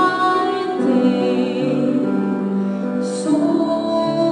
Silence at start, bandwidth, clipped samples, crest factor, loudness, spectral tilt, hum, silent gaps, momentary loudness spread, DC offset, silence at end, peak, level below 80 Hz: 0 s; 11 kHz; under 0.1%; 12 dB; -18 LUFS; -6.5 dB/octave; none; none; 5 LU; under 0.1%; 0 s; -4 dBFS; -64 dBFS